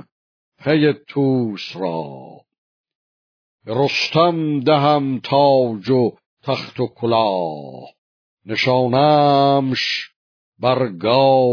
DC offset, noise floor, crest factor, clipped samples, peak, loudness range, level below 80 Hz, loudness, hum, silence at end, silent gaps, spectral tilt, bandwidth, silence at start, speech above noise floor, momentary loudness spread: under 0.1%; under -90 dBFS; 16 dB; under 0.1%; -2 dBFS; 5 LU; -64 dBFS; -18 LUFS; none; 0 s; 2.58-2.84 s, 2.95-3.59 s, 6.26-6.37 s, 7.98-8.37 s, 10.16-10.52 s; -6.5 dB/octave; 5.4 kHz; 0.6 s; over 73 dB; 13 LU